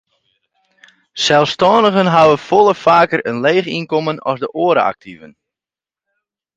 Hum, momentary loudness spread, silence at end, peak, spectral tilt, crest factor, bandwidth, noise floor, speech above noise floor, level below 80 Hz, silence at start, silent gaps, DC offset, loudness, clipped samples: none; 9 LU; 1.3 s; 0 dBFS; -5 dB/octave; 16 dB; 9.2 kHz; -90 dBFS; 76 dB; -58 dBFS; 1.15 s; none; under 0.1%; -13 LUFS; under 0.1%